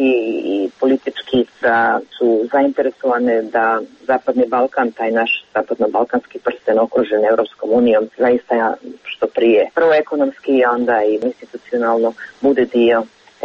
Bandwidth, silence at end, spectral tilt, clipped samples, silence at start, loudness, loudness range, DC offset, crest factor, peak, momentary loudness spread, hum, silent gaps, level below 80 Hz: 7 kHz; 0 s; -6.5 dB/octave; under 0.1%; 0 s; -16 LUFS; 2 LU; under 0.1%; 12 dB; -4 dBFS; 7 LU; none; none; -60 dBFS